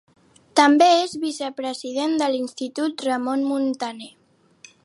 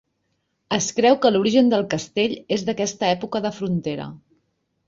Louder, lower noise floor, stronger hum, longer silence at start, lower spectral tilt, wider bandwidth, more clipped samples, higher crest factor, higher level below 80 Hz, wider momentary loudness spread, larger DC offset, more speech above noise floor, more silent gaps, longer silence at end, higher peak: about the same, -21 LUFS vs -21 LUFS; second, -51 dBFS vs -72 dBFS; neither; second, 0.55 s vs 0.7 s; second, -2.5 dB/octave vs -4.5 dB/octave; first, 11.5 kHz vs 7.8 kHz; neither; about the same, 20 dB vs 18 dB; second, -74 dBFS vs -60 dBFS; first, 14 LU vs 9 LU; neither; second, 31 dB vs 52 dB; neither; about the same, 0.75 s vs 0.7 s; about the same, -2 dBFS vs -4 dBFS